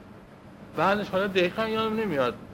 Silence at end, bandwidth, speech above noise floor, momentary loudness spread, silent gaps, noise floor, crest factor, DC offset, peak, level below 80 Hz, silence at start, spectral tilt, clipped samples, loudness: 0 s; 16.5 kHz; 22 dB; 3 LU; none; -48 dBFS; 18 dB; under 0.1%; -8 dBFS; -58 dBFS; 0 s; -6 dB/octave; under 0.1%; -26 LUFS